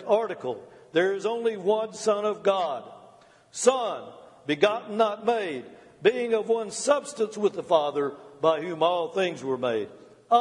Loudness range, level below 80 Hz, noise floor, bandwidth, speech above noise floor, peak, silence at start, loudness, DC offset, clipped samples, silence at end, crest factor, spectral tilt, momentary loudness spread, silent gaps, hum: 2 LU; -76 dBFS; -54 dBFS; 11.5 kHz; 29 dB; -6 dBFS; 0 s; -26 LUFS; under 0.1%; under 0.1%; 0 s; 20 dB; -3.5 dB/octave; 10 LU; none; none